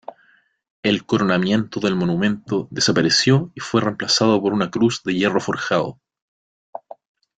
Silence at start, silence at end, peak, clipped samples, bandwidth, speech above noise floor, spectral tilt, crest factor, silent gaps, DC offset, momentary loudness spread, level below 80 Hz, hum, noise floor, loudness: 0.85 s; 1.45 s; -4 dBFS; under 0.1%; 9.4 kHz; 39 dB; -4.5 dB/octave; 18 dB; none; under 0.1%; 9 LU; -56 dBFS; none; -58 dBFS; -19 LUFS